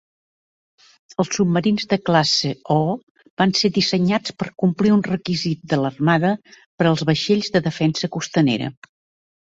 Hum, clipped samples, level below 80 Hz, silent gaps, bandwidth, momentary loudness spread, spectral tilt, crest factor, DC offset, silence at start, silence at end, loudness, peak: none; under 0.1%; -56 dBFS; 3.03-3.15 s, 3.30-3.37 s, 6.66-6.78 s; 8 kHz; 8 LU; -5.5 dB/octave; 18 dB; under 0.1%; 1.2 s; 0.8 s; -19 LUFS; -2 dBFS